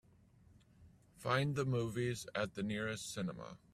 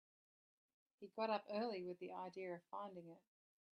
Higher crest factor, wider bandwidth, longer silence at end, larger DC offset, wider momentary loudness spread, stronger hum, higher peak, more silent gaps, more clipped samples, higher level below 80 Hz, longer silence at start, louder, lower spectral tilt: about the same, 22 dB vs 20 dB; first, 14.5 kHz vs 9.2 kHz; second, 0.2 s vs 0.6 s; neither; second, 8 LU vs 18 LU; neither; first, -18 dBFS vs -30 dBFS; neither; neither; first, -68 dBFS vs under -90 dBFS; second, 0.8 s vs 1 s; first, -39 LUFS vs -48 LUFS; about the same, -5.5 dB/octave vs -6.5 dB/octave